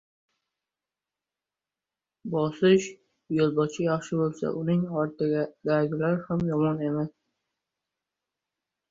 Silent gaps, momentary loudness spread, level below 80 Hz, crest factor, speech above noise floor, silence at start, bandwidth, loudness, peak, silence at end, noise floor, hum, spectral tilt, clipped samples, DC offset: none; 8 LU; -64 dBFS; 20 dB; over 64 dB; 2.25 s; 7.8 kHz; -27 LUFS; -10 dBFS; 1.8 s; under -90 dBFS; none; -7 dB/octave; under 0.1%; under 0.1%